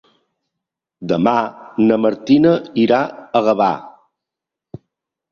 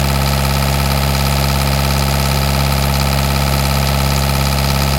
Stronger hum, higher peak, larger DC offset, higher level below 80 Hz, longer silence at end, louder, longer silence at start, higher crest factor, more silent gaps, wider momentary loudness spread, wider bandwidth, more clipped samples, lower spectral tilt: neither; about the same, -2 dBFS vs 0 dBFS; neither; second, -58 dBFS vs -20 dBFS; first, 1.4 s vs 0 s; about the same, -16 LUFS vs -15 LUFS; first, 1 s vs 0 s; about the same, 16 dB vs 14 dB; neither; first, 9 LU vs 0 LU; second, 7 kHz vs 17 kHz; neither; first, -7.5 dB/octave vs -4.5 dB/octave